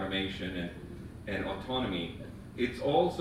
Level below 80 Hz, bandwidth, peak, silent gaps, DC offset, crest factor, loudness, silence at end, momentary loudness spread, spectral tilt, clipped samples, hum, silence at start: -52 dBFS; 15.5 kHz; -14 dBFS; none; under 0.1%; 20 dB; -34 LUFS; 0 s; 16 LU; -6.5 dB/octave; under 0.1%; none; 0 s